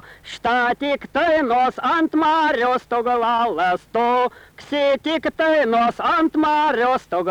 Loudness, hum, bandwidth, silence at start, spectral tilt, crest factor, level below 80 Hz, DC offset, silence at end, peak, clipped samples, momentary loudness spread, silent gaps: -19 LUFS; none; 12 kHz; 0.1 s; -5 dB/octave; 10 dB; -54 dBFS; under 0.1%; 0 s; -10 dBFS; under 0.1%; 5 LU; none